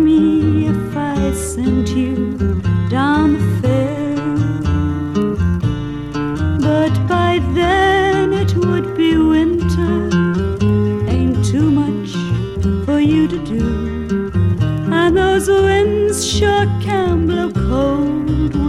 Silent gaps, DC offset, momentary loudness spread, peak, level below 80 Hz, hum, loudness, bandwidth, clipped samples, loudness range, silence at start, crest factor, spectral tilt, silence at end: none; under 0.1%; 6 LU; -2 dBFS; -28 dBFS; none; -16 LUFS; 13.5 kHz; under 0.1%; 3 LU; 0 s; 14 dB; -6.5 dB/octave; 0 s